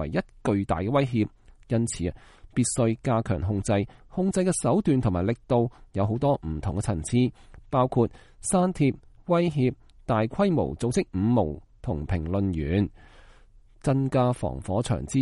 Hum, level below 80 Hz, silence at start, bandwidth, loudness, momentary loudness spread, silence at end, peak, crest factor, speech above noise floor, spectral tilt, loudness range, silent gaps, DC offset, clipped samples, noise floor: none; -44 dBFS; 0 s; 11.5 kHz; -26 LUFS; 7 LU; 0 s; -10 dBFS; 16 dB; 28 dB; -6.5 dB/octave; 2 LU; none; under 0.1%; under 0.1%; -53 dBFS